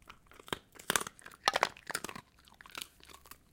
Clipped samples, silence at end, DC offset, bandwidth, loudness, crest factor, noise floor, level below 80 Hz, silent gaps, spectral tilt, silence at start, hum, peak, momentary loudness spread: under 0.1%; 0.2 s; under 0.1%; 17 kHz; -36 LUFS; 34 dB; -59 dBFS; -66 dBFS; none; -1 dB/octave; 0.1 s; none; -6 dBFS; 23 LU